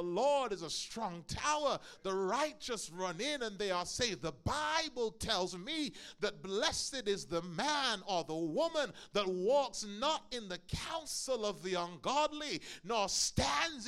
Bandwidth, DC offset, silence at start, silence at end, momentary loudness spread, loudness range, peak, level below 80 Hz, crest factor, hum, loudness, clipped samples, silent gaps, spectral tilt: 16 kHz; under 0.1%; 0 s; 0 s; 8 LU; 2 LU; -16 dBFS; -60 dBFS; 20 dB; none; -36 LUFS; under 0.1%; none; -3 dB/octave